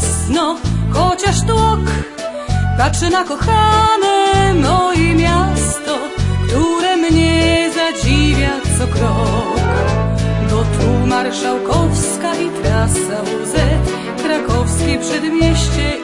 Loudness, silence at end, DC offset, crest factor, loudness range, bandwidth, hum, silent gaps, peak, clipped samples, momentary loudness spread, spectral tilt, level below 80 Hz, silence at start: -15 LUFS; 0 s; 0.2%; 14 dB; 3 LU; 11.5 kHz; none; none; 0 dBFS; under 0.1%; 6 LU; -5 dB/octave; -24 dBFS; 0 s